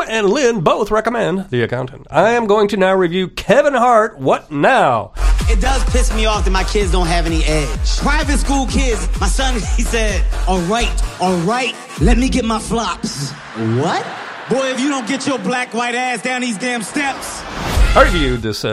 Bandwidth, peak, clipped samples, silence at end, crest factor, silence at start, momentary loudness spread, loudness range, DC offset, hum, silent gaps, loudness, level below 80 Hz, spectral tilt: 13.5 kHz; 0 dBFS; under 0.1%; 0 s; 16 dB; 0 s; 7 LU; 5 LU; under 0.1%; none; none; -16 LUFS; -20 dBFS; -4.5 dB/octave